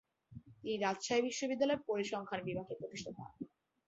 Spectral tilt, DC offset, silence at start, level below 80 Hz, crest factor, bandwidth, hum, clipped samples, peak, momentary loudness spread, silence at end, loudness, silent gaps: -3.5 dB/octave; under 0.1%; 0.3 s; -74 dBFS; 18 dB; 8 kHz; none; under 0.1%; -20 dBFS; 17 LU; 0.4 s; -38 LUFS; none